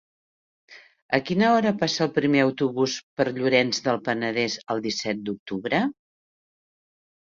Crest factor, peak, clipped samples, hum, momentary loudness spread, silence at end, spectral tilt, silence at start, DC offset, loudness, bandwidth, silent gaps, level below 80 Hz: 20 dB; -6 dBFS; under 0.1%; none; 8 LU; 1.5 s; -4.5 dB/octave; 0.7 s; under 0.1%; -24 LUFS; 7.6 kHz; 1.02-1.09 s, 3.03-3.17 s, 5.39-5.46 s; -66 dBFS